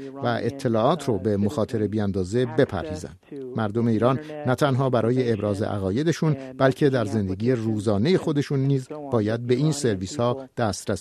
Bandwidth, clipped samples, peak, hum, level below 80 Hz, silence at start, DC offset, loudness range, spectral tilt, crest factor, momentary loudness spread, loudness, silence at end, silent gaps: 13.5 kHz; under 0.1%; -4 dBFS; none; -56 dBFS; 0 s; under 0.1%; 2 LU; -7 dB/octave; 18 dB; 6 LU; -24 LUFS; 0 s; none